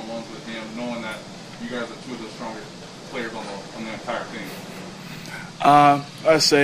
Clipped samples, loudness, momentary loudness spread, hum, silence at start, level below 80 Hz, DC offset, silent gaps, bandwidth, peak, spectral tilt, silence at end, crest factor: under 0.1%; -23 LUFS; 20 LU; none; 0 s; -58 dBFS; under 0.1%; none; 16 kHz; 0 dBFS; -4 dB/octave; 0 s; 22 dB